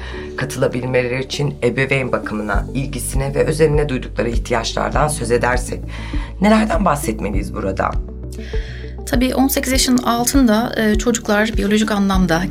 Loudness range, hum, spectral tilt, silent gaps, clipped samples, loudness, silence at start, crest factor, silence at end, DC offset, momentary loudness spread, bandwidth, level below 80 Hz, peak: 4 LU; none; -5 dB/octave; none; under 0.1%; -18 LUFS; 0 s; 16 dB; 0 s; under 0.1%; 12 LU; 16.5 kHz; -26 dBFS; -2 dBFS